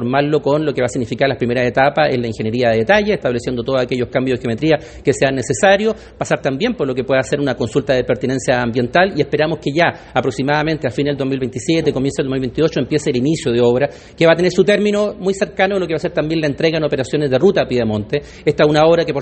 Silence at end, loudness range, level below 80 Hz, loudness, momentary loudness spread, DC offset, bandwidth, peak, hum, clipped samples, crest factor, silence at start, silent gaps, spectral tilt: 0 s; 2 LU; -44 dBFS; -16 LUFS; 6 LU; under 0.1%; 8.8 kHz; 0 dBFS; none; under 0.1%; 16 dB; 0 s; none; -5.5 dB/octave